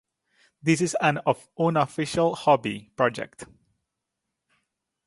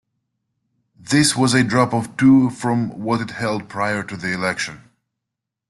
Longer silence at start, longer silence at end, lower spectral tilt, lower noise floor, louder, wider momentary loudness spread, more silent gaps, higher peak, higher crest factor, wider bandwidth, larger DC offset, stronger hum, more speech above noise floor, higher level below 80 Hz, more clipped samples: second, 0.65 s vs 1.05 s; first, 1.6 s vs 0.95 s; about the same, -5.5 dB/octave vs -4.5 dB/octave; about the same, -83 dBFS vs -83 dBFS; second, -24 LUFS vs -19 LUFS; about the same, 11 LU vs 10 LU; neither; second, -6 dBFS vs -2 dBFS; about the same, 20 dB vs 18 dB; about the same, 11.5 kHz vs 12.5 kHz; neither; neither; second, 59 dB vs 64 dB; second, -64 dBFS vs -56 dBFS; neither